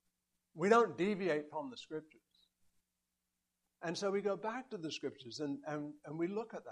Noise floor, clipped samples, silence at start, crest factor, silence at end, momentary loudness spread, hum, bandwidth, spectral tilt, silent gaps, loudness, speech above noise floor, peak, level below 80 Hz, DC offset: -88 dBFS; under 0.1%; 0.55 s; 24 dB; 0 s; 15 LU; 60 Hz at -75 dBFS; 11 kHz; -5.5 dB/octave; none; -38 LUFS; 50 dB; -16 dBFS; -84 dBFS; under 0.1%